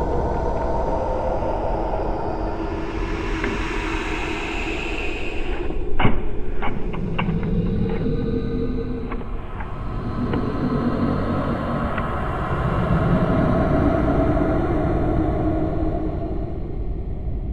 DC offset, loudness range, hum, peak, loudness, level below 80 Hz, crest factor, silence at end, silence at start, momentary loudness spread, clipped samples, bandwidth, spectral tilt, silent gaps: under 0.1%; 5 LU; none; -2 dBFS; -24 LUFS; -28 dBFS; 18 dB; 0 s; 0 s; 10 LU; under 0.1%; 8.4 kHz; -8 dB/octave; none